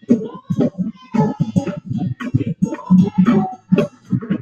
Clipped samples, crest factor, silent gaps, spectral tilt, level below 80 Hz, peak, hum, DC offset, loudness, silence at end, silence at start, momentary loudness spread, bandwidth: under 0.1%; 16 dB; none; -9 dB/octave; -52 dBFS; 0 dBFS; none; under 0.1%; -19 LUFS; 0 s; 0.1 s; 10 LU; 7 kHz